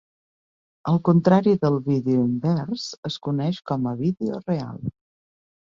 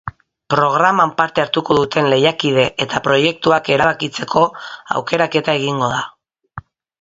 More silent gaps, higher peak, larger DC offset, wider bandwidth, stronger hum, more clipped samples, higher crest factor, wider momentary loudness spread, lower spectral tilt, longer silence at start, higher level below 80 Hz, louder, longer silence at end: first, 2.98-3.03 s vs none; second, -4 dBFS vs 0 dBFS; neither; about the same, 7.4 kHz vs 7.8 kHz; neither; neither; about the same, 18 dB vs 16 dB; second, 12 LU vs 15 LU; first, -8 dB/octave vs -5 dB/octave; first, 0.85 s vs 0.05 s; second, -58 dBFS vs -50 dBFS; second, -23 LUFS vs -16 LUFS; first, 0.75 s vs 0.4 s